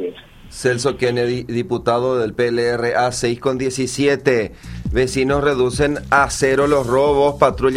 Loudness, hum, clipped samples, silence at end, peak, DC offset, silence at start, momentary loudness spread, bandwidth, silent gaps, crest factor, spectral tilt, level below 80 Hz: -18 LUFS; none; under 0.1%; 0 s; 0 dBFS; under 0.1%; 0 s; 7 LU; 15 kHz; none; 18 dB; -5 dB/octave; -36 dBFS